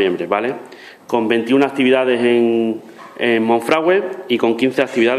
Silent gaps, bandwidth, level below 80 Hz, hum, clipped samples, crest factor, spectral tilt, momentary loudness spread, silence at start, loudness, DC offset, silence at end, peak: none; 13.5 kHz; -64 dBFS; none; under 0.1%; 16 dB; -5.5 dB/octave; 9 LU; 0 s; -16 LUFS; under 0.1%; 0 s; 0 dBFS